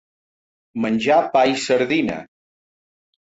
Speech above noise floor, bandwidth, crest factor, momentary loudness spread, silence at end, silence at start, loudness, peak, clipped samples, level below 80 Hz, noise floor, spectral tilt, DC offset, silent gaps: over 72 dB; 8 kHz; 16 dB; 12 LU; 1 s; 0.75 s; -19 LUFS; -6 dBFS; under 0.1%; -60 dBFS; under -90 dBFS; -4.5 dB/octave; under 0.1%; none